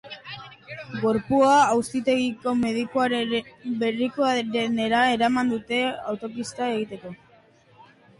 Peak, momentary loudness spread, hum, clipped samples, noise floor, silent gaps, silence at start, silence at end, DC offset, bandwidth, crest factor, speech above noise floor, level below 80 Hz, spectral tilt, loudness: -8 dBFS; 18 LU; none; under 0.1%; -56 dBFS; none; 0.05 s; 1.05 s; under 0.1%; 11.5 kHz; 16 dB; 33 dB; -60 dBFS; -4.5 dB/octave; -23 LUFS